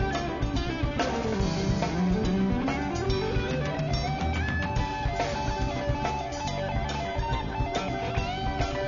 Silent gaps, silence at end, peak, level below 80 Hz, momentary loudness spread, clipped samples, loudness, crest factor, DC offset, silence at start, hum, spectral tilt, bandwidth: none; 0 s; -14 dBFS; -36 dBFS; 4 LU; under 0.1%; -29 LUFS; 14 dB; 0.1%; 0 s; none; -6 dB/octave; 7.4 kHz